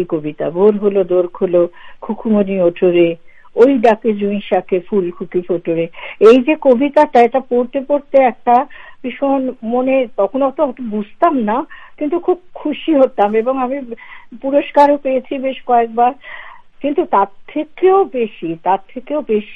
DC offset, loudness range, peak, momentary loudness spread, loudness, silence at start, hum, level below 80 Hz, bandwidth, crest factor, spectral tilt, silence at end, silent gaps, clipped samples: under 0.1%; 4 LU; 0 dBFS; 12 LU; -15 LUFS; 0 s; none; -52 dBFS; 8 kHz; 14 dB; -8 dB/octave; 0 s; none; under 0.1%